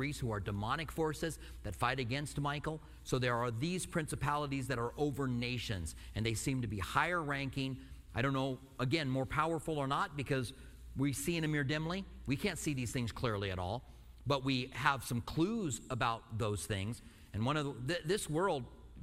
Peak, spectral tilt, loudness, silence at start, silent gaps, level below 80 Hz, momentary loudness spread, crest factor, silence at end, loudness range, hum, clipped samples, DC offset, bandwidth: -14 dBFS; -5 dB/octave; -37 LUFS; 0 s; none; -54 dBFS; 8 LU; 22 dB; 0 s; 1 LU; none; under 0.1%; under 0.1%; 16 kHz